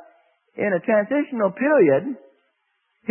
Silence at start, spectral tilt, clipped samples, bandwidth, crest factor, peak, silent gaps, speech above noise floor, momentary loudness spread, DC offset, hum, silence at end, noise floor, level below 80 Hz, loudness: 0.6 s; -11.5 dB/octave; under 0.1%; 3.2 kHz; 16 dB; -6 dBFS; none; 52 dB; 17 LU; under 0.1%; none; 0 s; -71 dBFS; -72 dBFS; -20 LUFS